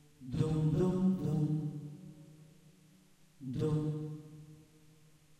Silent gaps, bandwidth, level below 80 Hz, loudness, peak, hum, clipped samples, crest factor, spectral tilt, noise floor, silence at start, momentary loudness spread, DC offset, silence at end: none; 9.6 kHz; -58 dBFS; -35 LUFS; -18 dBFS; none; under 0.1%; 18 dB; -9 dB/octave; -63 dBFS; 0.2 s; 22 LU; under 0.1%; 0.8 s